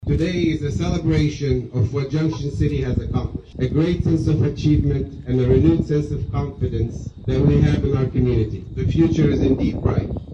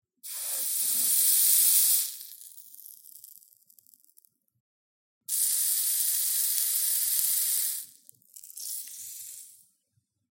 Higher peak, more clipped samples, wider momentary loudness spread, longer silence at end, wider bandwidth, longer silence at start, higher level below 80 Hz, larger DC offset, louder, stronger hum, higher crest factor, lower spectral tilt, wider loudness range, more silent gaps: about the same, -2 dBFS vs -4 dBFS; neither; second, 8 LU vs 26 LU; second, 0 s vs 0.8 s; second, 7.8 kHz vs 17 kHz; second, 0 s vs 0.25 s; first, -30 dBFS vs under -90 dBFS; neither; first, -20 LUFS vs -23 LUFS; neither; second, 16 dB vs 26 dB; first, -8.5 dB/octave vs 4.5 dB/octave; second, 2 LU vs 8 LU; second, none vs 4.60-5.21 s